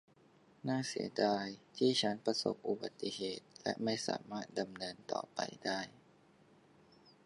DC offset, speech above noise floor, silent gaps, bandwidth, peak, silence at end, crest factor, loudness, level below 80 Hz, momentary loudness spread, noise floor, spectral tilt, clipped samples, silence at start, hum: under 0.1%; 28 dB; none; 11.5 kHz; -18 dBFS; 1.35 s; 20 dB; -38 LUFS; -80 dBFS; 9 LU; -66 dBFS; -4 dB/octave; under 0.1%; 0.65 s; none